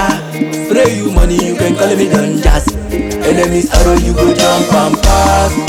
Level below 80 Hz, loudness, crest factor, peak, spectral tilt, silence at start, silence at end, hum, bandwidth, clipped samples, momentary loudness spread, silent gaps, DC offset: -16 dBFS; -11 LUFS; 10 dB; 0 dBFS; -5 dB/octave; 0 s; 0 s; none; 17 kHz; under 0.1%; 7 LU; none; under 0.1%